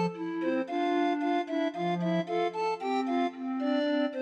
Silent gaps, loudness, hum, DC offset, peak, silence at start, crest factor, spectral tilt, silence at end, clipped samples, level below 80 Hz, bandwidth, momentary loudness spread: none; -30 LUFS; none; under 0.1%; -18 dBFS; 0 s; 12 dB; -7 dB/octave; 0 s; under 0.1%; -86 dBFS; 8.8 kHz; 4 LU